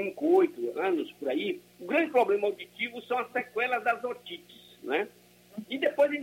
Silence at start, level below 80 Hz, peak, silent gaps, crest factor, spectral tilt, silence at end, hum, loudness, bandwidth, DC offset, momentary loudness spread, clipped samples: 0 s; -82 dBFS; -12 dBFS; none; 18 dB; -5 dB/octave; 0 s; 60 Hz at -65 dBFS; -29 LUFS; 16.5 kHz; under 0.1%; 15 LU; under 0.1%